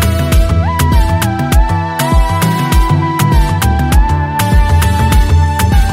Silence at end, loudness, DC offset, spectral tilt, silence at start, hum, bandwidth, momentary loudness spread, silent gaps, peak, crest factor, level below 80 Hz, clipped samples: 0 s; -12 LUFS; under 0.1%; -5.5 dB/octave; 0 s; none; 16.5 kHz; 3 LU; none; 0 dBFS; 10 dB; -12 dBFS; under 0.1%